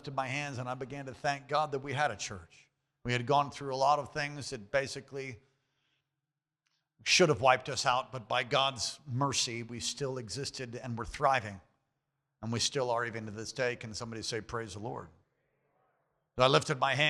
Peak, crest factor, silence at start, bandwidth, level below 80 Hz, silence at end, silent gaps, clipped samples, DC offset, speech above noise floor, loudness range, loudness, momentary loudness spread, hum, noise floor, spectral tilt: -10 dBFS; 24 dB; 0.05 s; 13.5 kHz; -62 dBFS; 0 s; none; under 0.1%; under 0.1%; 57 dB; 6 LU; -32 LUFS; 14 LU; none; -90 dBFS; -3.5 dB/octave